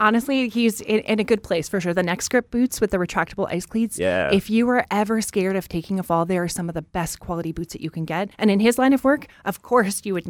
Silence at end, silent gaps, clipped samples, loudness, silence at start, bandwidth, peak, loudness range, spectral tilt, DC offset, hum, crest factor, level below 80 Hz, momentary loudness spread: 0 s; none; under 0.1%; -22 LUFS; 0 s; 19 kHz; -4 dBFS; 3 LU; -5 dB/octave; under 0.1%; none; 18 dB; -48 dBFS; 10 LU